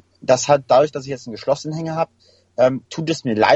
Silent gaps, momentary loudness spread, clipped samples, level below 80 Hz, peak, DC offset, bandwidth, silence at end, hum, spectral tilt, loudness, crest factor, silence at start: none; 11 LU; under 0.1%; -58 dBFS; -2 dBFS; under 0.1%; 8.2 kHz; 0 s; none; -4.5 dB/octave; -19 LUFS; 18 dB; 0.25 s